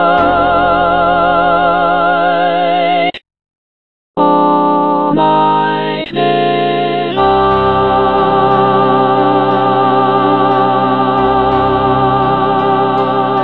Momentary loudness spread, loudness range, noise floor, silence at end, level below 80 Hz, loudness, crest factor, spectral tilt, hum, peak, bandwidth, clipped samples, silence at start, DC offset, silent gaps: 3 LU; 2 LU; under -90 dBFS; 0 s; -38 dBFS; -11 LUFS; 10 dB; -8.5 dB/octave; none; 0 dBFS; 5 kHz; under 0.1%; 0 s; 1%; 3.57-4.14 s